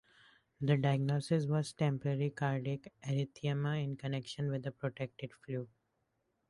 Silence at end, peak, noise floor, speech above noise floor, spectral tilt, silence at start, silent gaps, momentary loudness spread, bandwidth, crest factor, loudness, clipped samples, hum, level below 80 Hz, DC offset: 0.85 s; -18 dBFS; -81 dBFS; 46 dB; -7 dB/octave; 0.6 s; none; 11 LU; 11.5 kHz; 20 dB; -36 LUFS; under 0.1%; none; -70 dBFS; under 0.1%